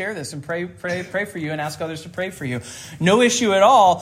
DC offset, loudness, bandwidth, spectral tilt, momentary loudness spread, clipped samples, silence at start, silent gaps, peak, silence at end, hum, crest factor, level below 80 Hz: under 0.1%; -20 LUFS; 15.5 kHz; -4 dB/octave; 16 LU; under 0.1%; 0 s; none; -2 dBFS; 0 s; none; 16 dB; -60 dBFS